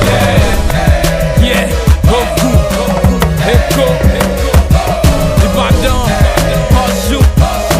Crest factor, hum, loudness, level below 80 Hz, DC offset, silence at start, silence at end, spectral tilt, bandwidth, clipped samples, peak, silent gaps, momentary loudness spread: 8 dB; none; -10 LUFS; -14 dBFS; under 0.1%; 0 s; 0 s; -5.5 dB/octave; 16 kHz; 0.8%; 0 dBFS; none; 2 LU